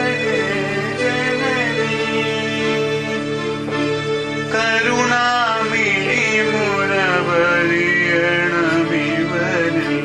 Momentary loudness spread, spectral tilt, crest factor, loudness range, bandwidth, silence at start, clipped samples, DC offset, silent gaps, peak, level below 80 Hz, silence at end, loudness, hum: 6 LU; -4.5 dB/octave; 16 dB; 4 LU; 12 kHz; 0 s; under 0.1%; under 0.1%; none; -2 dBFS; -52 dBFS; 0 s; -17 LUFS; none